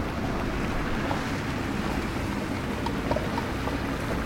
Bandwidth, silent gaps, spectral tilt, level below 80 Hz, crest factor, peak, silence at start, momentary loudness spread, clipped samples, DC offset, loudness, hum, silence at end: 16.5 kHz; none; -6 dB/octave; -38 dBFS; 16 dB; -12 dBFS; 0 s; 2 LU; under 0.1%; under 0.1%; -29 LUFS; none; 0 s